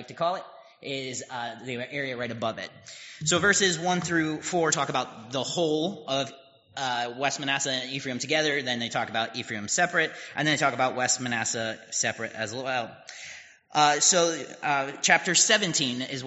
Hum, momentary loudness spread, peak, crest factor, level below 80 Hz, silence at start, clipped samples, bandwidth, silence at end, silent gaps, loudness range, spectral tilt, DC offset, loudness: none; 15 LU; -4 dBFS; 24 dB; -70 dBFS; 0 s; under 0.1%; 8 kHz; 0 s; none; 5 LU; -2 dB/octave; under 0.1%; -26 LUFS